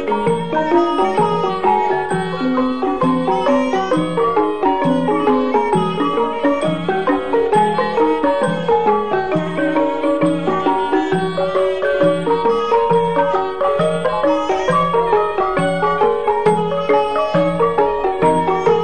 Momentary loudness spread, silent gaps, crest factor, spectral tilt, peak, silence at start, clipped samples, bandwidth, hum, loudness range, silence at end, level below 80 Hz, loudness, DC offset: 3 LU; none; 12 dB; -6.5 dB/octave; -4 dBFS; 0 s; under 0.1%; 9.4 kHz; none; 1 LU; 0 s; -46 dBFS; -16 LUFS; 2%